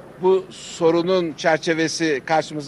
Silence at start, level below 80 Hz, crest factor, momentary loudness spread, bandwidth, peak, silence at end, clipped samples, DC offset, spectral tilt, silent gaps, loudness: 0 s; -62 dBFS; 16 dB; 3 LU; 12 kHz; -4 dBFS; 0 s; under 0.1%; under 0.1%; -4.5 dB/octave; none; -20 LUFS